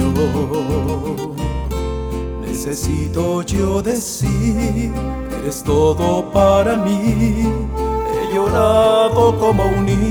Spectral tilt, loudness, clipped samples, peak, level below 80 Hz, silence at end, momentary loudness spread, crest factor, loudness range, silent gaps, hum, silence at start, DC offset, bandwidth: -6.5 dB/octave; -17 LUFS; under 0.1%; -2 dBFS; -28 dBFS; 0 s; 10 LU; 14 dB; 5 LU; none; none; 0 s; under 0.1%; over 20 kHz